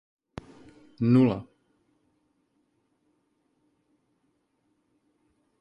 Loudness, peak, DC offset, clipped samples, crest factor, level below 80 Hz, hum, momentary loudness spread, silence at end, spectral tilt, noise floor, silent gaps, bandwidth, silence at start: -24 LUFS; -10 dBFS; under 0.1%; under 0.1%; 22 dB; -62 dBFS; none; 25 LU; 4.15 s; -10 dB/octave; -73 dBFS; none; 5.4 kHz; 1 s